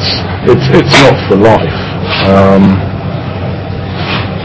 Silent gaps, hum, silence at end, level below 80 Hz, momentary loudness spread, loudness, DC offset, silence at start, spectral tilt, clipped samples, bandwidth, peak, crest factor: none; none; 0 s; -26 dBFS; 12 LU; -9 LUFS; under 0.1%; 0 s; -6 dB/octave; 6%; 8 kHz; 0 dBFS; 8 dB